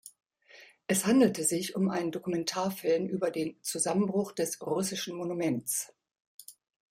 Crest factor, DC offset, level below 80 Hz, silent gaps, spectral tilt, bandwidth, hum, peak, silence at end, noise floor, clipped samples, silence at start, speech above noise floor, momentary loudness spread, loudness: 18 dB; under 0.1%; -72 dBFS; 6.20-6.39 s; -4 dB/octave; 16.5 kHz; none; -12 dBFS; 0.45 s; -57 dBFS; under 0.1%; 0.05 s; 27 dB; 9 LU; -30 LUFS